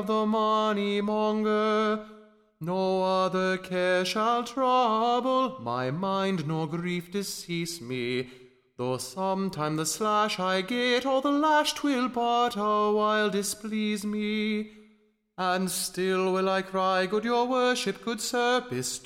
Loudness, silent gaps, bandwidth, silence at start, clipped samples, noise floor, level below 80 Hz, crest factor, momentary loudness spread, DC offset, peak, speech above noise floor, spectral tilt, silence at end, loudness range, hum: -27 LUFS; none; 16 kHz; 0 s; under 0.1%; -64 dBFS; -66 dBFS; 14 dB; 7 LU; under 0.1%; -12 dBFS; 37 dB; -4 dB/octave; 0.05 s; 6 LU; none